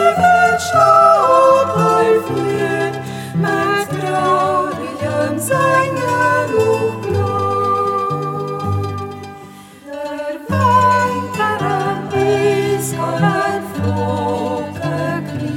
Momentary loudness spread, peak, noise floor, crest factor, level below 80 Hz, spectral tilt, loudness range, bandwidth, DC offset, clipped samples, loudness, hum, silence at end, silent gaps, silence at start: 11 LU; 0 dBFS; -37 dBFS; 16 dB; -54 dBFS; -5.5 dB/octave; 6 LU; 17 kHz; under 0.1%; under 0.1%; -16 LUFS; none; 0 s; none; 0 s